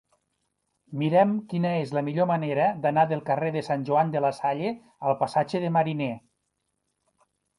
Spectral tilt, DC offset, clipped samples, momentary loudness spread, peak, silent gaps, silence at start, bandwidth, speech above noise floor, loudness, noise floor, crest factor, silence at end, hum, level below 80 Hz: -8 dB/octave; under 0.1%; under 0.1%; 8 LU; -8 dBFS; none; 0.9 s; 11.5 kHz; 53 dB; -26 LUFS; -78 dBFS; 18 dB; 1.4 s; none; -70 dBFS